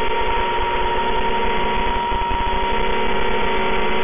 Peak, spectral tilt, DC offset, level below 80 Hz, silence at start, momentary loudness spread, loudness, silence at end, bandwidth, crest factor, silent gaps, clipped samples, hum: -10 dBFS; -8.5 dB/octave; 8%; -30 dBFS; 0 s; 1 LU; -20 LUFS; 0 s; 3.7 kHz; 8 dB; none; under 0.1%; none